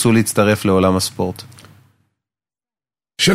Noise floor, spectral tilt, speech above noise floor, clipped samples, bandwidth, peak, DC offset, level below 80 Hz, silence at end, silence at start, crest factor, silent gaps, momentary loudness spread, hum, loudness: under -90 dBFS; -4.5 dB/octave; over 75 dB; under 0.1%; 16 kHz; -2 dBFS; under 0.1%; -52 dBFS; 0 s; 0 s; 16 dB; none; 15 LU; none; -16 LUFS